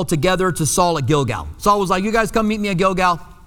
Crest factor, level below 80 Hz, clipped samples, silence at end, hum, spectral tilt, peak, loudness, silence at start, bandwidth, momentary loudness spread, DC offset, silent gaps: 16 dB; -36 dBFS; under 0.1%; 0.1 s; none; -4.5 dB/octave; -2 dBFS; -18 LUFS; 0 s; 19 kHz; 3 LU; under 0.1%; none